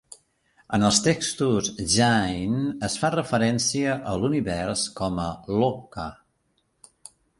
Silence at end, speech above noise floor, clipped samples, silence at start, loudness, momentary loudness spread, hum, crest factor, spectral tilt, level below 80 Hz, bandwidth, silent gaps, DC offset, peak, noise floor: 1.25 s; 47 dB; under 0.1%; 0.7 s; -24 LUFS; 9 LU; none; 20 dB; -4 dB/octave; -48 dBFS; 11.5 kHz; none; under 0.1%; -4 dBFS; -70 dBFS